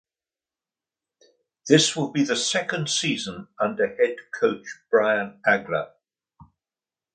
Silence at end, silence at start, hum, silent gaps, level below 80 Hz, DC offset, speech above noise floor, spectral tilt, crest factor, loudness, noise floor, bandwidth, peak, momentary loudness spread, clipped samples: 0.7 s; 1.65 s; none; none; -68 dBFS; under 0.1%; over 67 dB; -3.5 dB/octave; 24 dB; -23 LUFS; under -90 dBFS; 9.6 kHz; -2 dBFS; 10 LU; under 0.1%